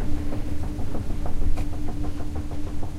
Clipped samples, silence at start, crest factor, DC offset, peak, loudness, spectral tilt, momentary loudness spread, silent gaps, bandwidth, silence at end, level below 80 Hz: under 0.1%; 0 s; 12 dB; under 0.1%; -10 dBFS; -32 LUFS; -7.5 dB/octave; 3 LU; none; 7.2 kHz; 0 s; -26 dBFS